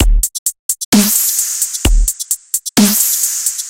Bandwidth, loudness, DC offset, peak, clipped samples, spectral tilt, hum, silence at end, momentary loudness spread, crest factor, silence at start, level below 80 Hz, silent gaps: 17.5 kHz; -13 LUFS; under 0.1%; 0 dBFS; under 0.1%; -2.5 dB/octave; none; 0 s; 7 LU; 14 dB; 0 s; -18 dBFS; 0.39-0.46 s, 0.59-0.69 s, 0.85-0.92 s